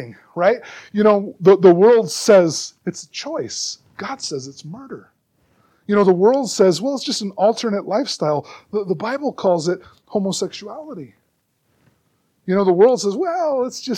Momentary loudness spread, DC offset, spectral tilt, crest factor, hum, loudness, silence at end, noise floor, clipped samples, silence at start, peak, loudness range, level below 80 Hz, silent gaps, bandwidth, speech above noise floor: 19 LU; under 0.1%; -5 dB/octave; 18 dB; none; -18 LUFS; 0 s; -67 dBFS; under 0.1%; 0 s; 0 dBFS; 9 LU; -68 dBFS; none; 13.5 kHz; 49 dB